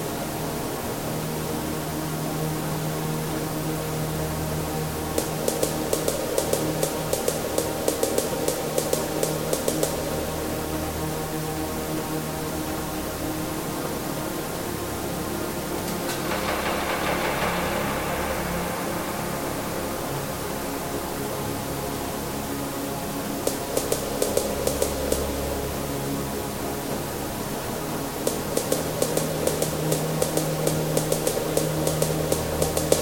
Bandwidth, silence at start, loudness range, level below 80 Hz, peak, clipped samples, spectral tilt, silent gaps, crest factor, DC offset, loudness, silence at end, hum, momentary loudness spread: 17 kHz; 0 s; 4 LU; -42 dBFS; -2 dBFS; under 0.1%; -4 dB/octave; none; 26 dB; under 0.1%; -27 LUFS; 0 s; none; 5 LU